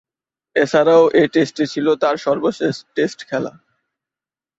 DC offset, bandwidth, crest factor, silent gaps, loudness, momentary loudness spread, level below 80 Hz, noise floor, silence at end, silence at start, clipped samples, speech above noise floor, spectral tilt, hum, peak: under 0.1%; 8 kHz; 16 dB; none; -17 LUFS; 12 LU; -62 dBFS; under -90 dBFS; 1.1 s; 0.55 s; under 0.1%; over 74 dB; -5.5 dB/octave; none; -2 dBFS